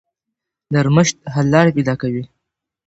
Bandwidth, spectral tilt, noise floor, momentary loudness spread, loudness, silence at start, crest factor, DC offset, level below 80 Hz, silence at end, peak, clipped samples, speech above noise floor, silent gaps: 8 kHz; -6 dB/octave; -81 dBFS; 11 LU; -16 LUFS; 0.7 s; 18 dB; under 0.1%; -50 dBFS; 0.6 s; 0 dBFS; under 0.1%; 66 dB; none